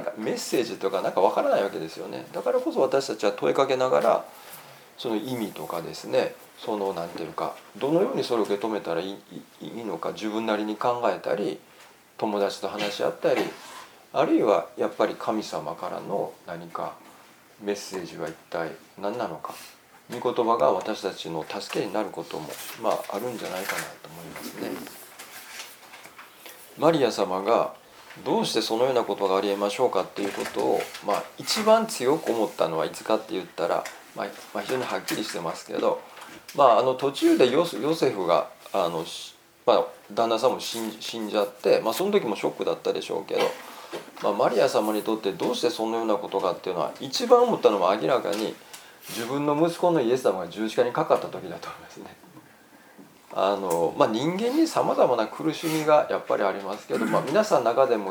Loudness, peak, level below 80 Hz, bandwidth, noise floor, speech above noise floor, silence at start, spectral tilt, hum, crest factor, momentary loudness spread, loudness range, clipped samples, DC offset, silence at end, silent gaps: -26 LUFS; -2 dBFS; -74 dBFS; over 20 kHz; -53 dBFS; 27 dB; 0 s; -4.5 dB/octave; none; 24 dB; 16 LU; 7 LU; under 0.1%; under 0.1%; 0 s; none